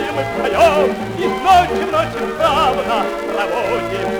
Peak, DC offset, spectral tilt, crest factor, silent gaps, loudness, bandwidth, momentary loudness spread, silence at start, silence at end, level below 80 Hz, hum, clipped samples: -2 dBFS; under 0.1%; -4.5 dB/octave; 14 dB; none; -16 LUFS; over 20 kHz; 8 LU; 0 s; 0 s; -38 dBFS; none; under 0.1%